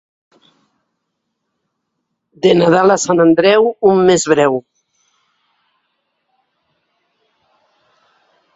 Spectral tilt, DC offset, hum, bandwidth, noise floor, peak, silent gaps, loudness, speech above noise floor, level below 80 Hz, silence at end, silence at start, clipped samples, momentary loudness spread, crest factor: -5 dB/octave; under 0.1%; none; 8 kHz; -73 dBFS; 0 dBFS; none; -12 LUFS; 62 dB; -58 dBFS; 3.95 s; 2.45 s; under 0.1%; 5 LU; 16 dB